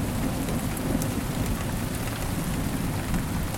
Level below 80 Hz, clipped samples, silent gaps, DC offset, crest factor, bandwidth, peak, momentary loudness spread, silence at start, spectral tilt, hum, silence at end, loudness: -34 dBFS; under 0.1%; none; under 0.1%; 16 dB; 17 kHz; -10 dBFS; 2 LU; 0 s; -5.5 dB/octave; none; 0 s; -29 LUFS